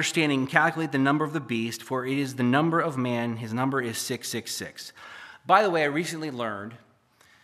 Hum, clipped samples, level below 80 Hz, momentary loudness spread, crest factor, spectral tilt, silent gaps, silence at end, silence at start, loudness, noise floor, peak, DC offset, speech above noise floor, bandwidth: none; under 0.1%; -76 dBFS; 16 LU; 24 dB; -4.5 dB/octave; none; 0.65 s; 0 s; -26 LUFS; -60 dBFS; -2 dBFS; under 0.1%; 34 dB; 15 kHz